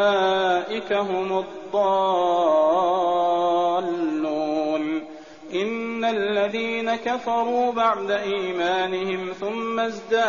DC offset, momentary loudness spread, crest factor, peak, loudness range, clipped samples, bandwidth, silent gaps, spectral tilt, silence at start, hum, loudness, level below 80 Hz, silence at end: 0.2%; 8 LU; 14 dB; -8 dBFS; 4 LU; under 0.1%; 7.2 kHz; none; -2.5 dB/octave; 0 s; none; -23 LUFS; -64 dBFS; 0 s